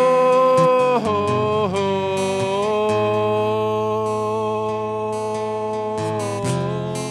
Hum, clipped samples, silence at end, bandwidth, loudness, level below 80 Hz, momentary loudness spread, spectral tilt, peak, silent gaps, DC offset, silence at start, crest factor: none; under 0.1%; 0 s; 13.5 kHz; -20 LUFS; -58 dBFS; 9 LU; -6 dB/octave; -4 dBFS; none; under 0.1%; 0 s; 14 dB